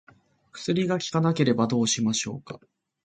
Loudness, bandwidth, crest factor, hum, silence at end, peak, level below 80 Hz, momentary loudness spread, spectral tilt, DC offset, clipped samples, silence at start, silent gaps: -25 LUFS; 9.4 kHz; 18 dB; none; 0.45 s; -8 dBFS; -64 dBFS; 16 LU; -4.5 dB/octave; under 0.1%; under 0.1%; 0.55 s; none